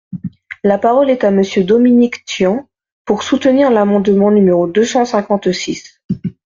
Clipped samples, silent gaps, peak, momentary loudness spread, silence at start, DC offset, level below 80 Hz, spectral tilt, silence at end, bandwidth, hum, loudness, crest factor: under 0.1%; 2.92-3.05 s, 6.04-6.09 s; -2 dBFS; 13 LU; 0.1 s; under 0.1%; -52 dBFS; -6 dB/octave; 0.2 s; 7.6 kHz; none; -13 LUFS; 12 dB